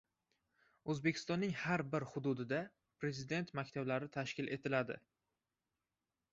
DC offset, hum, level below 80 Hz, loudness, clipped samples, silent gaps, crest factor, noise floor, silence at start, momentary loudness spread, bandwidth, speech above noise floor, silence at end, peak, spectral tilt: under 0.1%; none; -76 dBFS; -40 LUFS; under 0.1%; none; 20 dB; under -90 dBFS; 0.85 s; 7 LU; 7.6 kHz; over 50 dB; 1.35 s; -22 dBFS; -5 dB/octave